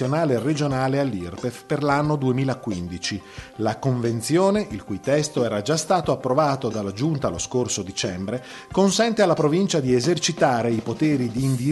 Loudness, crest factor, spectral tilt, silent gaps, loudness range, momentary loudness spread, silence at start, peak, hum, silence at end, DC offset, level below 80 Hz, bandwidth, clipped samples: -22 LUFS; 18 dB; -5.5 dB/octave; none; 3 LU; 9 LU; 0 s; -4 dBFS; none; 0 s; under 0.1%; -52 dBFS; 12 kHz; under 0.1%